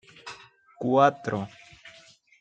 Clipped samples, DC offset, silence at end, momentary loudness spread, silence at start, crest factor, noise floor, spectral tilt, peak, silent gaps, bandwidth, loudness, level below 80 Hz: under 0.1%; under 0.1%; 0.5 s; 27 LU; 0.25 s; 22 dB; -55 dBFS; -6.5 dB/octave; -6 dBFS; none; 9 kHz; -25 LUFS; -70 dBFS